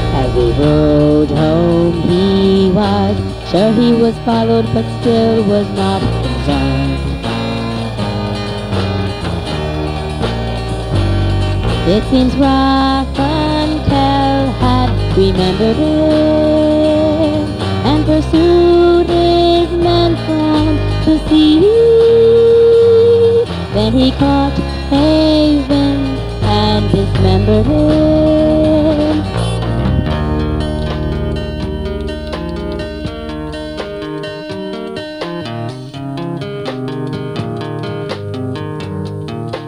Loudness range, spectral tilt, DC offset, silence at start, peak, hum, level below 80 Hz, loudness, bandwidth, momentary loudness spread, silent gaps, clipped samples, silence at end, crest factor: 12 LU; -7.5 dB/octave; under 0.1%; 0 s; 0 dBFS; none; -24 dBFS; -13 LUFS; 11.5 kHz; 13 LU; none; under 0.1%; 0 s; 12 dB